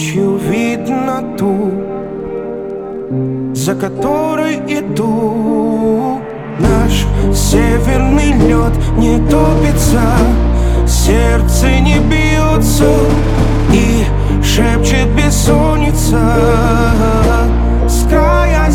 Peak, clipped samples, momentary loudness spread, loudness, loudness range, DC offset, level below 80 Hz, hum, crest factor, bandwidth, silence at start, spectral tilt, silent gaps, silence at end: 0 dBFS; under 0.1%; 7 LU; -12 LUFS; 6 LU; under 0.1%; -16 dBFS; none; 10 dB; 17 kHz; 0 s; -6 dB/octave; none; 0 s